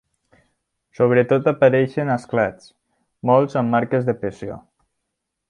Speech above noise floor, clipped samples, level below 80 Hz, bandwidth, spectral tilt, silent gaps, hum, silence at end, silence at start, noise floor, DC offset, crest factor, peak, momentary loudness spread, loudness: 60 dB; under 0.1%; -58 dBFS; 10 kHz; -8.5 dB/octave; none; none; 0.9 s; 1 s; -78 dBFS; under 0.1%; 18 dB; -2 dBFS; 12 LU; -19 LUFS